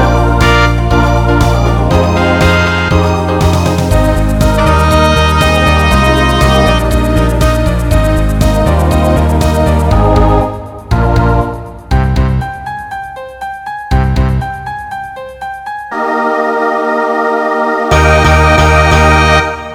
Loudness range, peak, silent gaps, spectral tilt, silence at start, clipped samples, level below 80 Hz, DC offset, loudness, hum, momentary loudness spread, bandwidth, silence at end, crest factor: 6 LU; 0 dBFS; none; -6 dB/octave; 0 s; 0.4%; -16 dBFS; under 0.1%; -10 LUFS; none; 14 LU; 16.5 kHz; 0 s; 10 dB